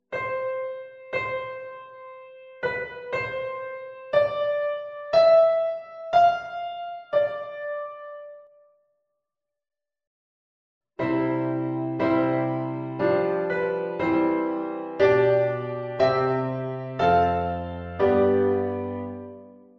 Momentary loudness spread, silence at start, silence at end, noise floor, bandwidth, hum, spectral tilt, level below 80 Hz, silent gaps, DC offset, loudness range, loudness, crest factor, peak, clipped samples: 16 LU; 0.1 s; 0.25 s; -86 dBFS; 7 kHz; none; -8 dB/octave; -56 dBFS; 10.07-10.81 s; under 0.1%; 10 LU; -24 LUFS; 18 dB; -8 dBFS; under 0.1%